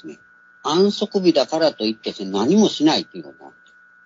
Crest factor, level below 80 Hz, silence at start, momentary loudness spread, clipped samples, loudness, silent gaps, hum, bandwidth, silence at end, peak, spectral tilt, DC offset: 18 dB; -66 dBFS; 0.05 s; 14 LU; under 0.1%; -19 LUFS; none; none; 7.8 kHz; 0.55 s; -2 dBFS; -5 dB/octave; under 0.1%